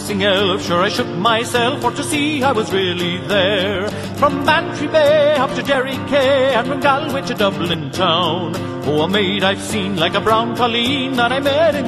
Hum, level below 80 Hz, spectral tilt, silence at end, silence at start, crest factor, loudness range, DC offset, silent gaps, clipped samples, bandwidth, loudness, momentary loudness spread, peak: none; -44 dBFS; -4.5 dB/octave; 0 s; 0 s; 16 dB; 2 LU; under 0.1%; none; under 0.1%; 13.5 kHz; -16 LUFS; 6 LU; 0 dBFS